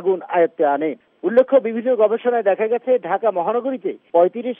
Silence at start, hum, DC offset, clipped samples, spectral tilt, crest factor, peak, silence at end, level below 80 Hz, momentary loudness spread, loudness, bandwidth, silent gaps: 0 s; none; under 0.1%; under 0.1%; -4.5 dB/octave; 16 dB; -4 dBFS; 0.05 s; -74 dBFS; 6 LU; -19 LUFS; 3.7 kHz; none